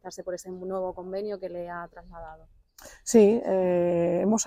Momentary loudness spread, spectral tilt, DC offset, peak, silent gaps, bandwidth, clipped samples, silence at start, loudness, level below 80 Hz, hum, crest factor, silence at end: 24 LU; -5.5 dB/octave; under 0.1%; -6 dBFS; none; 16 kHz; under 0.1%; 0.05 s; -26 LUFS; -58 dBFS; none; 20 dB; 0 s